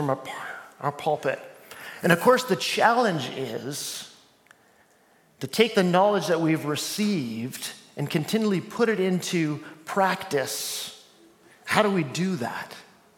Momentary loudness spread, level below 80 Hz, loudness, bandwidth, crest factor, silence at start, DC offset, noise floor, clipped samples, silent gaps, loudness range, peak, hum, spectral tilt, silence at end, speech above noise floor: 16 LU; -74 dBFS; -25 LUFS; 17.5 kHz; 24 dB; 0 s; under 0.1%; -60 dBFS; under 0.1%; none; 3 LU; -2 dBFS; none; -4.5 dB/octave; 0.35 s; 36 dB